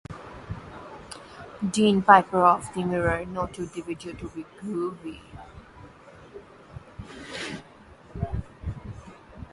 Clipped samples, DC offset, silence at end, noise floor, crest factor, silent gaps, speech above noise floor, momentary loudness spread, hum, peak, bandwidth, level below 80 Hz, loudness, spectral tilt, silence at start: under 0.1%; under 0.1%; 0.1 s; -50 dBFS; 26 dB; none; 26 dB; 25 LU; none; 0 dBFS; 11.5 kHz; -46 dBFS; -25 LUFS; -5.5 dB/octave; 0.1 s